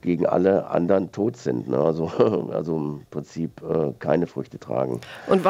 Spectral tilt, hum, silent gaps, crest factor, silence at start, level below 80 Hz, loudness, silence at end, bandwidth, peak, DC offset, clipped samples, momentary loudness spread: -8 dB/octave; none; none; 20 dB; 0.05 s; -60 dBFS; -24 LUFS; 0 s; 11.5 kHz; -4 dBFS; under 0.1%; under 0.1%; 11 LU